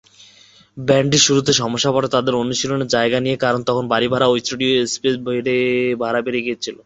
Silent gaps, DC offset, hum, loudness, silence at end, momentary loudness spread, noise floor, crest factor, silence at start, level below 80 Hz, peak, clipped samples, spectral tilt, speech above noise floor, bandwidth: none; under 0.1%; none; -17 LUFS; 0.1 s; 7 LU; -49 dBFS; 16 dB; 0.75 s; -54 dBFS; -2 dBFS; under 0.1%; -3.5 dB/octave; 31 dB; 8.2 kHz